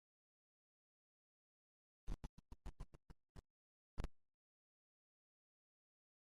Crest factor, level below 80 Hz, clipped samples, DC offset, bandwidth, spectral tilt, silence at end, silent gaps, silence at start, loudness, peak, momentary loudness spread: 26 dB; -60 dBFS; under 0.1%; under 0.1%; 12 kHz; -6.5 dB/octave; 2.1 s; 2.29-2.37 s, 3.29-3.35 s, 3.50-3.97 s; 2.1 s; -59 LUFS; -32 dBFS; 13 LU